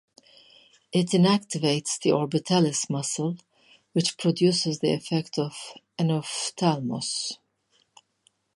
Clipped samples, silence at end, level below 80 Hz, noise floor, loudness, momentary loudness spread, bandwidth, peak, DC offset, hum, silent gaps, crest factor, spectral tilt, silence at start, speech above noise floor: under 0.1%; 1.2 s; -72 dBFS; -69 dBFS; -25 LUFS; 9 LU; 11.5 kHz; -8 dBFS; under 0.1%; none; none; 18 dB; -5 dB/octave; 0.95 s; 44 dB